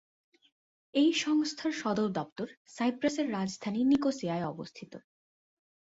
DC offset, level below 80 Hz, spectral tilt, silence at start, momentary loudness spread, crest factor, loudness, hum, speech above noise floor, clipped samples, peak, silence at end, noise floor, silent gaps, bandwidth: under 0.1%; -72 dBFS; -5 dB/octave; 0.95 s; 15 LU; 16 dB; -31 LUFS; none; over 59 dB; under 0.1%; -16 dBFS; 0.95 s; under -90 dBFS; 2.32-2.36 s, 2.57-2.65 s; 8 kHz